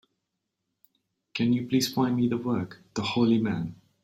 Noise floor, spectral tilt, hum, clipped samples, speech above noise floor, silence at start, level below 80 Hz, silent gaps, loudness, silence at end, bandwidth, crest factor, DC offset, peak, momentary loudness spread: -82 dBFS; -5.5 dB/octave; none; under 0.1%; 56 dB; 1.35 s; -64 dBFS; none; -27 LUFS; 0.3 s; 16 kHz; 16 dB; under 0.1%; -12 dBFS; 10 LU